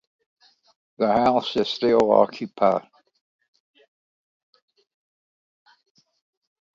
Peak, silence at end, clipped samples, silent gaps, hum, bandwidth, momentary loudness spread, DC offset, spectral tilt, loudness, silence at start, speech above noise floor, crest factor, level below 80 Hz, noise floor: -2 dBFS; 3.95 s; under 0.1%; none; none; 7.6 kHz; 7 LU; under 0.1%; -6 dB/octave; -21 LUFS; 1 s; over 70 dB; 22 dB; -64 dBFS; under -90 dBFS